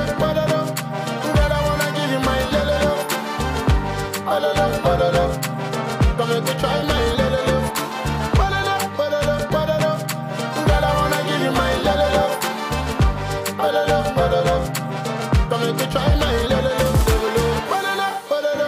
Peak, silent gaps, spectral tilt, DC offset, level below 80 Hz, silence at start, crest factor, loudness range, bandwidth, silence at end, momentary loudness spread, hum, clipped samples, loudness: -8 dBFS; none; -5 dB/octave; under 0.1%; -28 dBFS; 0 s; 10 dB; 1 LU; 16 kHz; 0 s; 6 LU; none; under 0.1%; -20 LUFS